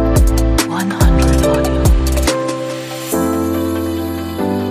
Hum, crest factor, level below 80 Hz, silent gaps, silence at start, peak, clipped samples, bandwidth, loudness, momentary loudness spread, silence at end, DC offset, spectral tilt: none; 14 dB; -18 dBFS; none; 0 s; 0 dBFS; under 0.1%; 15.5 kHz; -16 LUFS; 8 LU; 0 s; under 0.1%; -5.5 dB/octave